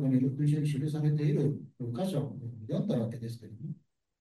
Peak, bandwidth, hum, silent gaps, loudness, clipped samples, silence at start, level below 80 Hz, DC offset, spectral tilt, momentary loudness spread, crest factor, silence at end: -16 dBFS; 12 kHz; none; none; -32 LUFS; under 0.1%; 0 s; -70 dBFS; under 0.1%; -8.5 dB/octave; 15 LU; 14 dB; 0.45 s